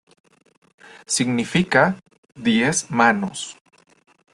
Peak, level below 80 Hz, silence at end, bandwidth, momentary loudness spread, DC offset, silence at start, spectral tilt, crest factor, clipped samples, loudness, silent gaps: -2 dBFS; -60 dBFS; 0.8 s; 12.5 kHz; 13 LU; under 0.1%; 1.1 s; -4 dB/octave; 20 dB; under 0.1%; -19 LUFS; 2.18-2.23 s